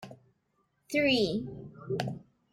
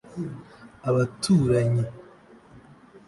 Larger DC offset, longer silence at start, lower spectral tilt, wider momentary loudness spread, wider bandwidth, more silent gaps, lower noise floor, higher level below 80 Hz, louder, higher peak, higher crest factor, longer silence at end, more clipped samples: neither; about the same, 0 s vs 0.1 s; second, -5 dB/octave vs -7 dB/octave; first, 20 LU vs 15 LU; first, 16 kHz vs 11.5 kHz; neither; first, -75 dBFS vs -51 dBFS; second, -64 dBFS vs -52 dBFS; second, -30 LUFS vs -25 LUFS; second, -14 dBFS vs -10 dBFS; about the same, 20 dB vs 16 dB; first, 0.3 s vs 0.1 s; neither